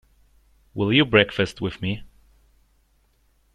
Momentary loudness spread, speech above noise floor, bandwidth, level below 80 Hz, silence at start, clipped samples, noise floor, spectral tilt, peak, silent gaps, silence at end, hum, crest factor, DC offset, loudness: 15 LU; 42 dB; 11 kHz; -50 dBFS; 0.75 s; under 0.1%; -63 dBFS; -6 dB/octave; -2 dBFS; none; 1.5 s; none; 24 dB; under 0.1%; -21 LUFS